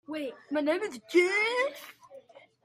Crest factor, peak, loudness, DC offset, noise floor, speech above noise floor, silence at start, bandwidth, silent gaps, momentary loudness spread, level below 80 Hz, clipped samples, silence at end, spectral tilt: 18 dB; -12 dBFS; -28 LUFS; under 0.1%; -53 dBFS; 24 dB; 0.1 s; 15.5 kHz; none; 15 LU; -82 dBFS; under 0.1%; 0.45 s; -2.5 dB/octave